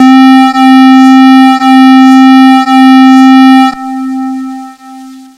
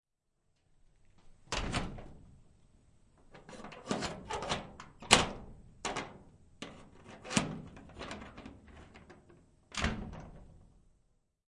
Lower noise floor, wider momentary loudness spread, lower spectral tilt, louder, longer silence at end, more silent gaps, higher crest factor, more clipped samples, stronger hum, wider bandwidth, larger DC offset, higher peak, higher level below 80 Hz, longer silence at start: second, -27 dBFS vs -79 dBFS; second, 14 LU vs 23 LU; about the same, -3 dB/octave vs -3 dB/octave; first, -2 LUFS vs -35 LUFS; second, 0.2 s vs 0.85 s; neither; second, 2 dB vs 36 dB; first, 30% vs under 0.1%; neither; about the same, 11.5 kHz vs 11.5 kHz; neither; first, 0 dBFS vs -4 dBFS; second, -58 dBFS vs -52 dBFS; second, 0 s vs 1.2 s